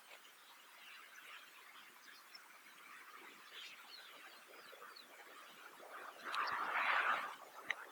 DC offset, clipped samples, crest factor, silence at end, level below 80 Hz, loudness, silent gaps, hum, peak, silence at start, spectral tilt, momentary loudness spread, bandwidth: under 0.1%; under 0.1%; 28 dB; 0 s; under -90 dBFS; -43 LUFS; none; none; -18 dBFS; 0 s; 0 dB/octave; 20 LU; over 20 kHz